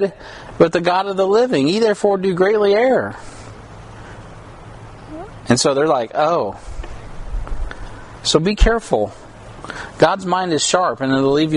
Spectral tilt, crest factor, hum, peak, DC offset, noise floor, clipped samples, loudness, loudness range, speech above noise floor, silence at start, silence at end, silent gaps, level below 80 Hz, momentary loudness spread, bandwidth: -4.5 dB/octave; 18 dB; none; 0 dBFS; under 0.1%; -37 dBFS; under 0.1%; -17 LUFS; 5 LU; 20 dB; 0 s; 0 s; none; -30 dBFS; 22 LU; 11 kHz